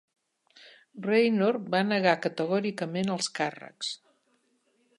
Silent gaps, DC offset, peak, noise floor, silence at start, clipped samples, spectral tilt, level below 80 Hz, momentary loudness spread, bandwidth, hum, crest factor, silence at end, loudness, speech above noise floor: none; under 0.1%; -8 dBFS; -71 dBFS; 0.65 s; under 0.1%; -5 dB/octave; -78 dBFS; 11 LU; 11.5 kHz; none; 22 dB; 1.05 s; -28 LUFS; 44 dB